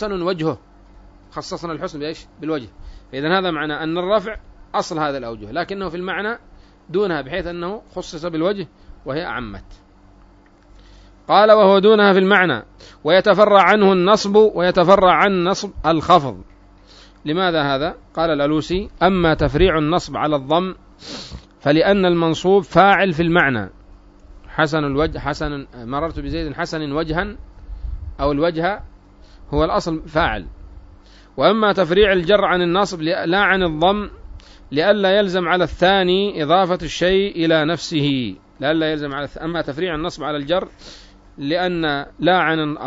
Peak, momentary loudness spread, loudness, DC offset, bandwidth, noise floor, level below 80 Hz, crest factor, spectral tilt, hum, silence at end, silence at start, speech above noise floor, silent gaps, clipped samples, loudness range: 0 dBFS; 17 LU; -18 LUFS; under 0.1%; 7.8 kHz; -49 dBFS; -38 dBFS; 18 dB; -6 dB/octave; none; 0 s; 0 s; 31 dB; none; under 0.1%; 11 LU